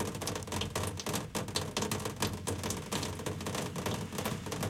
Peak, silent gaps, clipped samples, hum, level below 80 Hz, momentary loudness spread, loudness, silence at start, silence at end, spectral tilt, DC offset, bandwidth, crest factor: -16 dBFS; none; under 0.1%; none; -56 dBFS; 3 LU; -36 LUFS; 0 s; 0 s; -4 dB/octave; under 0.1%; 17 kHz; 20 dB